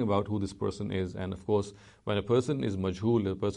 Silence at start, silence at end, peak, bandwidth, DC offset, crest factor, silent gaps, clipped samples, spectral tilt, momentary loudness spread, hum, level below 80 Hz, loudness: 0 s; 0 s; -14 dBFS; 10.5 kHz; under 0.1%; 16 dB; none; under 0.1%; -7 dB/octave; 7 LU; none; -56 dBFS; -31 LUFS